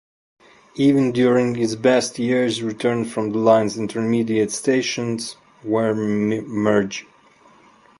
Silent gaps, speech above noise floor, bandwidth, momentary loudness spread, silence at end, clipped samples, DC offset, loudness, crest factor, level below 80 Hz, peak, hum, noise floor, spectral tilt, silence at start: none; 33 dB; 11.5 kHz; 8 LU; 0.95 s; under 0.1%; under 0.1%; -20 LUFS; 18 dB; -60 dBFS; -2 dBFS; none; -52 dBFS; -5.5 dB/octave; 0.75 s